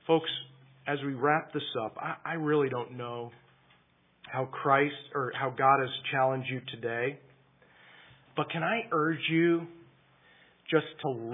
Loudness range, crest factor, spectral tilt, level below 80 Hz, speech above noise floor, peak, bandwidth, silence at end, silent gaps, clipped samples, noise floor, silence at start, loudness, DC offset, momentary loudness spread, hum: 3 LU; 22 dB; -9.5 dB/octave; -80 dBFS; 36 dB; -10 dBFS; 3.9 kHz; 0 s; none; under 0.1%; -66 dBFS; 0.05 s; -30 LUFS; under 0.1%; 13 LU; none